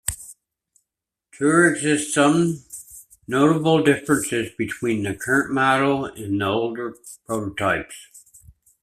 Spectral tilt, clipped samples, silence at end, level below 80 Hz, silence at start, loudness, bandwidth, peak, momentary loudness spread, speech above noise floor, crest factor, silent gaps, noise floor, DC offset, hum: -4.5 dB/octave; under 0.1%; 0.65 s; -54 dBFS; 0.05 s; -21 LUFS; 14.5 kHz; -2 dBFS; 20 LU; 64 dB; 20 dB; none; -84 dBFS; under 0.1%; none